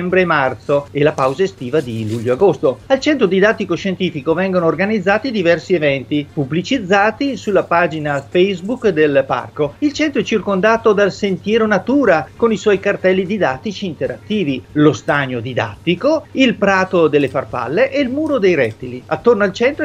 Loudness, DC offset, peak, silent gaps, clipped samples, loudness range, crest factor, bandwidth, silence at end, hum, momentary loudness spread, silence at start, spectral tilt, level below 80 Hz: -16 LUFS; under 0.1%; 0 dBFS; none; under 0.1%; 2 LU; 16 dB; 10.5 kHz; 0 s; none; 7 LU; 0 s; -6 dB/octave; -50 dBFS